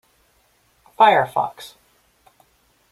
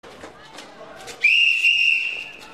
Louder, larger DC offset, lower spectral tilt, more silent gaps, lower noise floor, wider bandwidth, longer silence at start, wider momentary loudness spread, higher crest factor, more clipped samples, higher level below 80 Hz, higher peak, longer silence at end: about the same, -17 LUFS vs -16 LUFS; second, under 0.1% vs 0.2%; first, -4.5 dB/octave vs 0.5 dB/octave; neither; first, -61 dBFS vs -42 dBFS; first, 15.5 kHz vs 13.5 kHz; first, 1 s vs 0.05 s; first, 25 LU vs 15 LU; first, 22 dB vs 14 dB; neither; about the same, -66 dBFS vs -64 dBFS; first, -2 dBFS vs -8 dBFS; first, 1.25 s vs 0 s